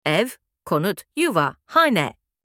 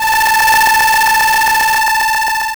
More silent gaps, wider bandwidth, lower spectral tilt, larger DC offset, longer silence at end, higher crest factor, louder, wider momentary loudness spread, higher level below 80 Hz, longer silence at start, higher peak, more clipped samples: neither; second, 17.5 kHz vs over 20 kHz; first, -5 dB/octave vs 1 dB/octave; second, under 0.1% vs 0.6%; first, 0.35 s vs 0 s; first, 20 dB vs 6 dB; second, -21 LUFS vs -10 LUFS; first, 11 LU vs 4 LU; second, -64 dBFS vs -40 dBFS; about the same, 0.05 s vs 0 s; first, -2 dBFS vs -6 dBFS; neither